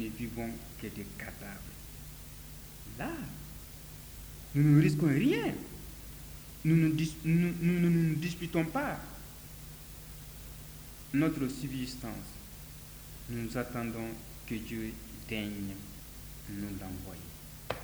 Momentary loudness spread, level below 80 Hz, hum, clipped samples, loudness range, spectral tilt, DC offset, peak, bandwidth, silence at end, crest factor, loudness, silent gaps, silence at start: 19 LU; -52 dBFS; none; under 0.1%; 12 LU; -6.5 dB/octave; under 0.1%; -14 dBFS; over 20 kHz; 0 s; 20 dB; -33 LUFS; none; 0 s